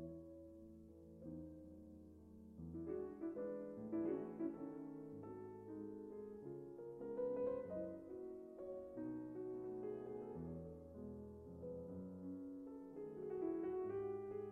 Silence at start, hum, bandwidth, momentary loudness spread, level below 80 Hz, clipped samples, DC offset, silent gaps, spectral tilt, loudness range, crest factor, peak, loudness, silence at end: 0 s; none; 3.2 kHz; 14 LU; -76 dBFS; under 0.1%; under 0.1%; none; -10.5 dB/octave; 4 LU; 16 dB; -34 dBFS; -49 LUFS; 0 s